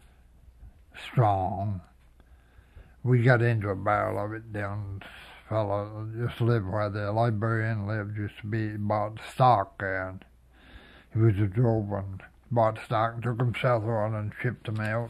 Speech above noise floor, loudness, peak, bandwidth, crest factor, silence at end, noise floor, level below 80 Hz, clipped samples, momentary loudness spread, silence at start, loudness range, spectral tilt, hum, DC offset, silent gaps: 29 dB; -28 LUFS; -6 dBFS; 11 kHz; 22 dB; 0 s; -56 dBFS; -56 dBFS; under 0.1%; 12 LU; 0.6 s; 3 LU; -8.5 dB/octave; none; under 0.1%; none